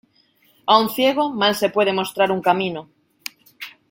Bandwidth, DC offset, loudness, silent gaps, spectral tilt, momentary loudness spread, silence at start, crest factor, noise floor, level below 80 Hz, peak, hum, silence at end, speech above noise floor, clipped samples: 17 kHz; under 0.1%; -19 LUFS; none; -4 dB/octave; 18 LU; 0.65 s; 20 dB; -59 dBFS; -66 dBFS; -2 dBFS; none; 0.2 s; 41 dB; under 0.1%